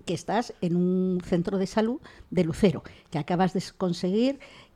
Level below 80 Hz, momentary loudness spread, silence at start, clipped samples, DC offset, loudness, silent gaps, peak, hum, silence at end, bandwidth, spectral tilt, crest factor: -52 dBFS; 9 LU; 0.05 s; under 0.1%; under 0.1%; -27 LUFS; none; -10 dBFS; none; 0.15 s; 11.5 kHz; -7 dB/octave; 18 dB